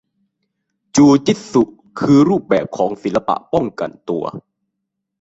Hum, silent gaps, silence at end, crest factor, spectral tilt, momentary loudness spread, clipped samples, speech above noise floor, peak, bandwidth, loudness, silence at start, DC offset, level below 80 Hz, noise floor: none; none; 0.8 s; 16 dB; -6 dB/octave; 12 LU; under 0.1%; 62 dB; -2 dBFS; 8 kHz; -16 LUFS; 0.95 s; under 0.1%; -52 dBFS; -77 dBFS